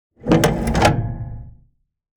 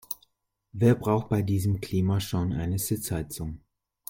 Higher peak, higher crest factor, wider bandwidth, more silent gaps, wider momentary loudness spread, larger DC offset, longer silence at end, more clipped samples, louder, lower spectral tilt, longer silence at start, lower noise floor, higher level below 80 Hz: first, 0 dBFS vs -10 dBFS; about the same, 20 dB vs 18 dB; first, 19.5 kHz vs 17 kHz; neither; first, 17 LU vs 14 LU; neither; first, 0.65 s vs 0.5 s; neither; first, -18 LUFS vs -27 LUFS; about the same, -5.5 dB/octave vs -6.5 dB/octave; first, 0.25 s vs 0.1 s; second, -56 dBFS vs -70 dBFS; first, -32 dBFS vs -50 dBFS